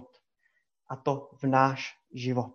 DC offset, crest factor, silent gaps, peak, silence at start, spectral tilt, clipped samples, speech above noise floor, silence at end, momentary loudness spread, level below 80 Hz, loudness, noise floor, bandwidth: under 0.1%; 24 dB; none; -8 dBFS; 0 s; -7 dB/octave; under 0.1%; 46 dB; 0.05 s; 13 LU; -74 dBFS; -29 LUFS; -75 dBFS; 7 kHz